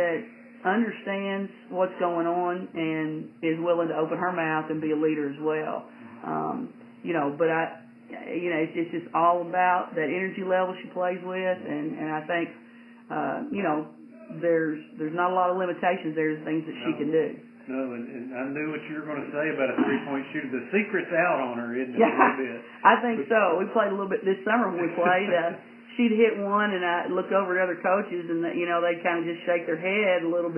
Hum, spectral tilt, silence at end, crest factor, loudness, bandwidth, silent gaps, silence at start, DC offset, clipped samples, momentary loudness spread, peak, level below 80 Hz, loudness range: none; -9 dB/octave; 0 s; 24 dB; -27 LUFS; 3.3 kHz; none; 0 s; under 0.1%; under 0.1%; 10 LU; -4 dBFS; -84 dBFS; 6 LU